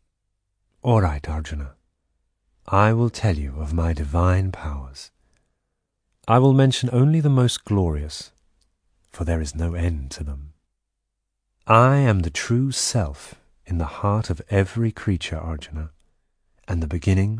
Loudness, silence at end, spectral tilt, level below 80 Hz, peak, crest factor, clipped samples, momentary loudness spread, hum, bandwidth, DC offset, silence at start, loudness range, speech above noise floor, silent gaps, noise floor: -21 LUFS; 0 s; -6 dB/octave; -34 dBFS; -2 dBFS; 20 dB; under 0.1%; 17 LU; none; 10.5 kHz; under 0.1%; 0.85 s; 6 LU; 58 dB; none; -79 dBFS